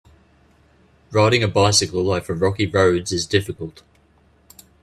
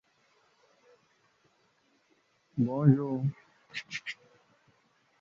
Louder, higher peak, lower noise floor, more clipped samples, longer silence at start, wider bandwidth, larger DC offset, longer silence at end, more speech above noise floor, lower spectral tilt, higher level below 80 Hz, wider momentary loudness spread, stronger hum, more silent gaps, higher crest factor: first, -18 LUFS vs -31 LUFS; first, -2 dBFS vs -10 dBFS; second, -56 dBFS vs -71 dBFS; neither; second, 1.1 s vs 2.55 s; first, 13.5 kHz vs 7.4 kHz; neither; about the same, 1.1 s vs 1.1 s; second, 38 dB vs 43 dB; second, -4 dB/octave vs -8 dB/octave; first, -50 dBFS vs -72 dBFS; second, 10 LU vs 18 LU; neither; neither; about the same, 20 dB vs 24 dB